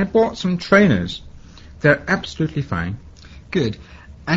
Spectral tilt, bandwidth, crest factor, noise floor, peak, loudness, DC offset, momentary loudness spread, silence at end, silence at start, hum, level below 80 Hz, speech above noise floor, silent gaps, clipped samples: -6.5 dB/octave; 8 kHz; 20 dB; -40 dBFS; 0 dBFS; -19 LUFS; under 0.1%; 18 LU; 0 s; 0 s; none; -42 dBFS; 22 dB; none; under 0.1%